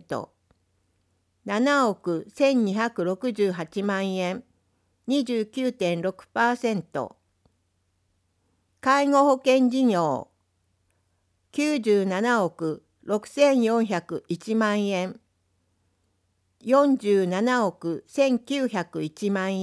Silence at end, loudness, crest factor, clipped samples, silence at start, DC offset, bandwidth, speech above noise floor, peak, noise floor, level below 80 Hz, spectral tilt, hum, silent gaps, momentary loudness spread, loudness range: 0 s; -24 LUFS; 18 dB; under 0.1%; 0.1 s; under 0.1%; 11 kHz; 48 dB; -8 dBFS; -71 dBFS; -74 dBFS; -5.5 dB/octave; none; none; 12 LU; 4 LU